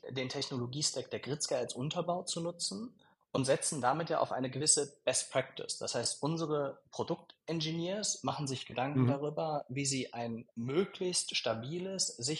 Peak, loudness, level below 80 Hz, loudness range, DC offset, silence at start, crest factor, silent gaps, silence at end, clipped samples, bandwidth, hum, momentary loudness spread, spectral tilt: -14 dBFS; -35 LUFS; -76 dBFS; 3 LU; under 0.1%; 0.05 s; 20 dB; none; 0 s; under 0.1%; 11.5 kHz; none; 8 LU; -3.5 dB/octave